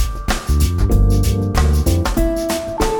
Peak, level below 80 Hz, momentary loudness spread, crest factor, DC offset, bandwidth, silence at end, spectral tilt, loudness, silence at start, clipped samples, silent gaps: -4 dBFS; -18 dBFS; 5 LU; 12 dB; under 0.1%; over 20 kHz; 0 s; -6 dB/octave; -17 LUFS; 0 s; under 0.1%; none